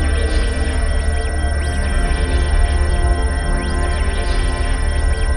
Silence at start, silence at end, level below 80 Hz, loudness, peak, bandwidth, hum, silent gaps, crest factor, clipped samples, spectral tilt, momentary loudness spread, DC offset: 0 s; 0 s; -16 dBFS; -19 LUFS; -4 dBFS; 11 kHz; none; none; 12 dB; under 0.1%; -5.5 dB/octave; 2 LU; 0.4%